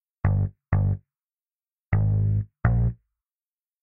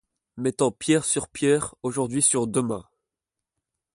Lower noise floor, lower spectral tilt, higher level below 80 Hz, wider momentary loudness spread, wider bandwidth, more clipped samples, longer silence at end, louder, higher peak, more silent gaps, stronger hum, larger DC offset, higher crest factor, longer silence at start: about the same, under -90 dBFS vs -87 dBFS; first, -11.5 dB/octave vs -4 dB/octave; first, -34 dBFS vs -60 dBFS; second, 5 LU vs 9 LU; second, 2.8 kHz vs 11.5 kHz; neither; second, 0.9 s vs 1.15 s; about the same, -25 LUFS vs -24 LUFS; about the same, -6 dBFS vs -8 dBFS; first, 1.31-1.35 s vs none; neither; neither; about the same, 20 dB vs 18 dB; about the same, 0.25 s vs 0.35 s